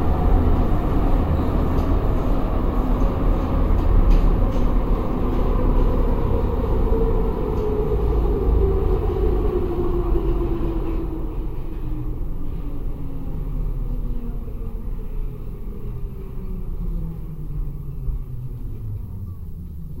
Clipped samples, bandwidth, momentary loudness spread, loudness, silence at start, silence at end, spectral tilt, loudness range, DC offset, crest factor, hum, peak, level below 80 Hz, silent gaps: under 0.1%; 4.6 kHz; 13 LU; -24 LUFS; 0 s; 0 s; -9.5 dB/octave; 10 LU; 0.3%; 16 dB; none; -4 dBFS; -22 dBFS; none